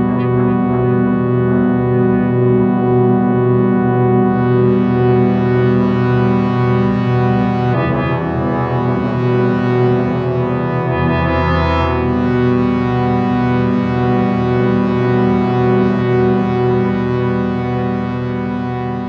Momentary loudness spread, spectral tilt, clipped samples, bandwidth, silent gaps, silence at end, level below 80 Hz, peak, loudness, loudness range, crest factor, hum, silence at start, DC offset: 4 LU; -10 dB/octave; under 0.1%; 5.8 kHz; none; 0 s; -34 dBFS; -2 dBFS; -14 LUFS; 2 LU; 12 dB; none; 0 s; under 0.1%